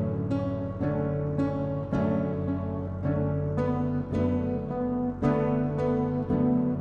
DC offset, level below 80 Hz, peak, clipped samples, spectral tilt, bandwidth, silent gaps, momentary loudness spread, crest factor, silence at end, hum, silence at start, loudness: under 0.1%; -48 dBFS; -12 dBFS; under 0.1%; -10.5 dB/octave; 6.8 kHz; none; 5 LU; 14 dB; 0 s; none; 0 s; -28 LUFS